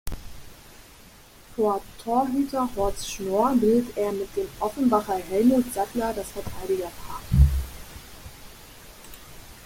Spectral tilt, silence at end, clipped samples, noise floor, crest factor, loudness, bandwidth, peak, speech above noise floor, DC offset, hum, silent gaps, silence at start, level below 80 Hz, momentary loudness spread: -6.5 dB/octave; 0 s; under 0.1%; -49 dBFS; 20 dB; -25 LUFS; 16.5 kHz; -4 dBFS; 25 dB; under 0.1%; none; none; 0.05 s; -34 dBFS; 23 LU